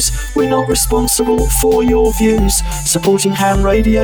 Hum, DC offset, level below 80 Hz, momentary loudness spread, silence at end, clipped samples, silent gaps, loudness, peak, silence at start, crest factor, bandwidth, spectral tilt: none; under 0.1%; -20 dBFS; 3 LU; 0 s; under 0.1%; none; -13 LUFS; -2 dBFS; 0 s; 10 dB; over 20 kHz; -4 dB/octave